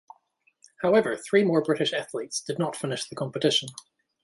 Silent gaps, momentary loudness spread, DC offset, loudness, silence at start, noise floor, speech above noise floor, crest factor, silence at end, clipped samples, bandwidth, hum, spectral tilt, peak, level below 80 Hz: none; 9 LU; under 0.1%; -26 LUFS; 0.8 s; -68 dBFS; 42 dB; 20 dB; 0.45 s; under 0.1%; 11.5 kHz; none; -4 dB/octave; -8 dBFS; -70 dBFS